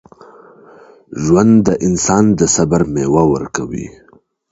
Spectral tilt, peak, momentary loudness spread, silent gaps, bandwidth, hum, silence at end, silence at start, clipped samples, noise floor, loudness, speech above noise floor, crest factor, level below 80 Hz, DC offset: -5.5 dB/octave; 0 dBFS; 15 LU; none; 8 kHz; none; 0.65 s; 1.1 s; under 0.1%; -42 dBFS; -13 LUFS; 30 dB; 14 dB; -40 dBFS; under 0.1%